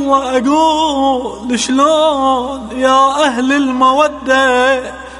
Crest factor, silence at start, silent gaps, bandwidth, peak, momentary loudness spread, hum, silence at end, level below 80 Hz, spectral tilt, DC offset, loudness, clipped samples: 12 dB; 0 s; none; 11.5 kHz; 0 dBFS; 7 LU; none; 0 s; -42 dBFS; -3 dB/octave; under 0.1%; -12 LUFS; under 0.1%